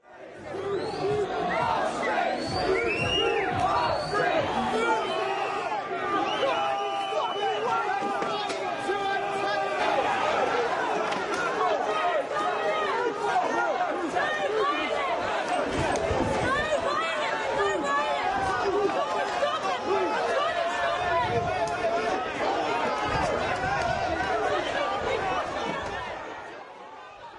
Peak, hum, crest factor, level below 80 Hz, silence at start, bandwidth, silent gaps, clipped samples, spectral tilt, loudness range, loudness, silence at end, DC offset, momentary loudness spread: -12 dBFS; none; 14 dB; -52 dBFS; 0.1 s; 11.5 kHz; none; under 0.1%; -4 dB/octave; 2 LU; -27 LUFS; 0 s; under 0.1%; 5 LU